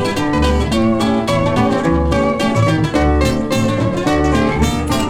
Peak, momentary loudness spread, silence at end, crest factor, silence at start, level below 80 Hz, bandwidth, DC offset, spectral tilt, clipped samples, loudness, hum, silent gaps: 0 dBFS; 2 LU; 0 s; 14 dB; 0 s; -24 dBFS; 16 kHz; under 0.1%; -6 dB/octave; under 0.1%; -15 LUFS; none; none